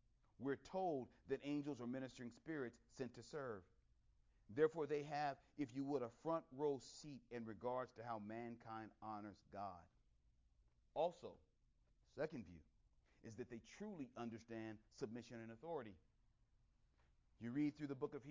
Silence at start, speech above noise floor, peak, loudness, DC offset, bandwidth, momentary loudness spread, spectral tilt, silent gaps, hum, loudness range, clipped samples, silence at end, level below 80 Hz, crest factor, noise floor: 0.4 s; 30 dB; -26 dBFS; -49 LUFS; under 0.1%; 7.6 kHz; 12 LU; -6.5 dB/octave; none; none; 9 LU; under 0.1%; 0 s; -78 dBFS; 24 dB; -79 dBFS